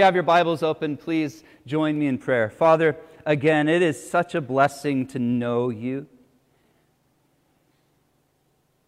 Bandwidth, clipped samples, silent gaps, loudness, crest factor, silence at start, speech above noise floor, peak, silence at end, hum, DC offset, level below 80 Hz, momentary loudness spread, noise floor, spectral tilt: 14 kHz; under 0.1%; none; -22 LUFS; 18 dB; 0 s; 45 dB; -4 dBFS; 2.8 s; none; under 0.1%; -66 dBFS; 9 LU; -67 dBFS; -6.5 dB/octave